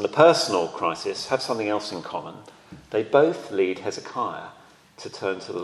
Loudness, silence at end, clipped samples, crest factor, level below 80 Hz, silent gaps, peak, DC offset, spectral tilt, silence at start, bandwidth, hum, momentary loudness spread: -24 LUFS; 0 s; under 0.1%; 22 dB; -68 dBFS; none; -2 dBFS; under 0.1%; -4 dB/octave; 0 s; 12.5 kHz; none; 18 LU